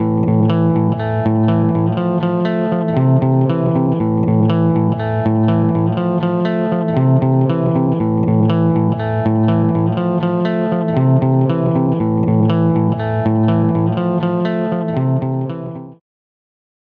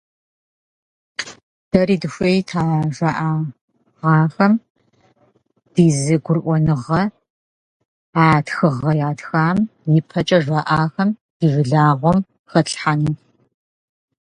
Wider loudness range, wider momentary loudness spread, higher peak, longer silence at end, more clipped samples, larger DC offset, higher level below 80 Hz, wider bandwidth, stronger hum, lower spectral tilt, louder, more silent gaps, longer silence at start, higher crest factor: about the same, 2 LU vs 3 LU; second, 4 LU vs 9 LU; second, -4 dBFS vs 0 dBFS; about the same, 1.05 s vs 1.15 s; neither; neither; about the same, -50 dBFS vs -50 dBFS; second, 4.6 kHz vs 10.5 kHz; neither; first, -11.5 dB/octave vs -6.5 dB/octave; about the same, -16 LUFS vs -18 LUFS; second, none vs 1.43-1.71 s, 3.61-3.68 s, 4.70-4.75 s, 7.30-8.13 s, 11.21-11.40 s, 12.39-12.44 s; second, 0 s vs 1.2 s; second, 12 dB vs 18 dB